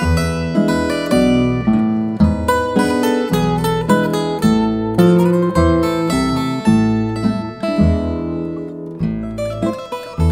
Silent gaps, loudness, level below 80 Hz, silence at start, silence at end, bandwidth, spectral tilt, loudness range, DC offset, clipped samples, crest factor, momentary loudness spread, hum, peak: none; -16 LUFS; -30 dBFS; 0 s; 0 s; 16 kHz; -7 dB/octave; 4 LU; under 0.1%; under 0.1%; 16 dB; 8 LU; none; 0 dBFS